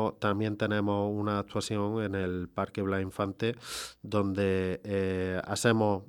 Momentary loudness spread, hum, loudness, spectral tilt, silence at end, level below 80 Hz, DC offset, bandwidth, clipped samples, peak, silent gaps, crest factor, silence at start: 6 LU; none; -31 LUFS; -5.5 dB/octave; 0.05 s; -62 dBFS; under 0.1%; 19 kHz; under 0.1%; -12 dBFS; none; 20 dB; 0 s